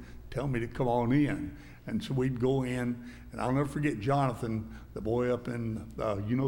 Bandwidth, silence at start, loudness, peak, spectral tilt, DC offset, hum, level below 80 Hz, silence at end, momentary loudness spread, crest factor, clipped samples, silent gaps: 16.5 kHz; 0 s; -32 LUFS; -16 dBFS; -8 dB/octave; under 0.1%; none; -50 dBFS; 0 s; 11 LU; 16 dB; under 0.1%; none